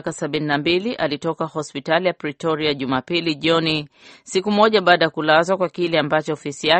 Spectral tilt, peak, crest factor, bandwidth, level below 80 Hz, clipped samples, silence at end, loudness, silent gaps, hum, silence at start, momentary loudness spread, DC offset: -4.5 dB/octave; 0 dBFS; 20 dB; 8.8 kHz; -58 dBFS; under 0.1%; 0 s; -20 LUFS; none; none; 0.05 s; 9 LU; under 0.1%